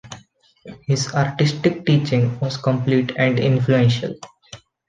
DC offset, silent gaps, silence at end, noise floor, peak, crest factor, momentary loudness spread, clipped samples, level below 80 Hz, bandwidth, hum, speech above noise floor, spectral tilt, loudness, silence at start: under 0.1%; none; 0.3 s; -50 dBFS; -4 dBFS; 16 dB; 18 LU; under 0.1%; -54 dBFS; 9.4 kHz; none; 31 dB; -6.5 dB/octave; -19 LUFS; 0.05 s